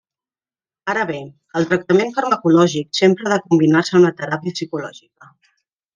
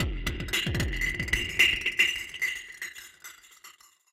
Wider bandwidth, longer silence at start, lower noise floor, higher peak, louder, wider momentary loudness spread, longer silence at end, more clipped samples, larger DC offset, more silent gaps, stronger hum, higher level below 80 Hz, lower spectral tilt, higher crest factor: second, 9.6 kHz vs 16.5 kHz; first, 0.85 s vs 0 s; first, under -90 dBFS vs -54 dBFS; first, -2 dBFS vs -8 dBFS; first, -17 LUFS vs -26 LUFS; second, 13 LU vs 21 LU; first, 1.05 s vs 0.4 s; neither; neither; neither; neither; second, -64 dBFS vs -40 dBFS; first, -6 dB/octave vs -2.5 dB/octave; second, 16 dB vs 22 dB